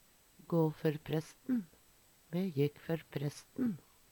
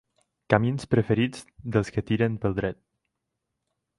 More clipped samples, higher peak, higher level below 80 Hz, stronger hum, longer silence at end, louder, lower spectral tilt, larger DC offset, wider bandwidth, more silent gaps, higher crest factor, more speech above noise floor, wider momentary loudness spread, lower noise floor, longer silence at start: neither; second, -18 dBFS vs -4 dBFS; second, -72 dBFS vs -50 dBFS; neither; second, 0.3 s vs 1.25 s; second, -37 LUFS vs -26 LUFS; about the same, -7.5 dB/octave vs -7.5 dB/octave; neither; first, 19 kHz vs 11.5 kHz; neither; about the same, 20 dB vs 24 dB; second, 30 dB vs 57 dB; about the same, 8 LU vs 8 LU; second, -66 dBFS vs -82 dBFS; about the same, 0.5 s vs 0.5 s